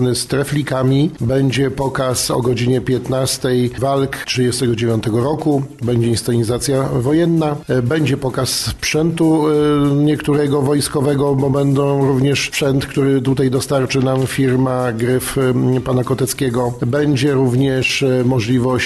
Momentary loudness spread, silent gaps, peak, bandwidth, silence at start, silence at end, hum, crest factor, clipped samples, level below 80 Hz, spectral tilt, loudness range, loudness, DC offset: 3 LU; none; -4 dBFS; 13 kHz; 0 s; 0 s; none; 10 dB; under 0.1%; -42 dBFS; -5.5 dB/octave; 2 LU; -16 LUFS; under 0.1%